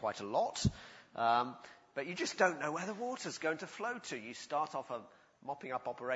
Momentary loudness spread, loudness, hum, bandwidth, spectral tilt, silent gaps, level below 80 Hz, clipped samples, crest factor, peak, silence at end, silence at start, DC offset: 14 LU; -38 LUFS; none; 8 kHz; -4 dB/octave; none; -60 dBFS; under 0.1%; 24 dB; -14 dBFS; 0 s; 0 s; under 0.1%